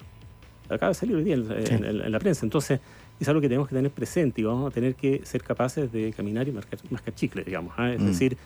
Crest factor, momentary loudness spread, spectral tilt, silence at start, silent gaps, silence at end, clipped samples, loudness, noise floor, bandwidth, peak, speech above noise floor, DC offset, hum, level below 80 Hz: 16 dB; 7 LU; -6.5 dB/octave; 0 s; none; 0 s; under 0.1%; -27 LUFS; -48 dBFS; over 20 kHz; -12 dBFS; 22 dB; under 0.1%; none; -52 dBFS